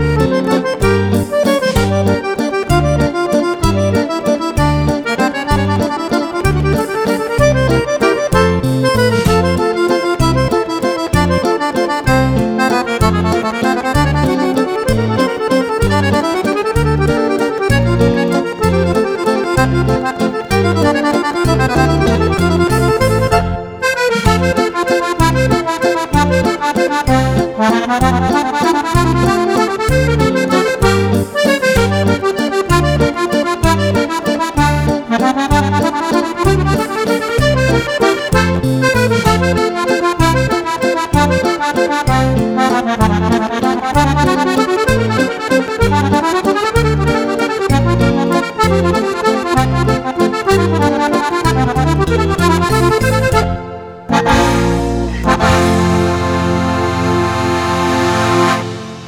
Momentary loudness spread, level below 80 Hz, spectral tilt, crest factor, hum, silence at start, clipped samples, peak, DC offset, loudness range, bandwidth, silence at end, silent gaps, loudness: 3 LU; -26 dBFS; -6 dB/octave; 12 dB; none; 0 s; under 0.1%; 0 dBFS; under 0.1%; 1 LU; over 20 kHz; 0 s; none; -13 LUFS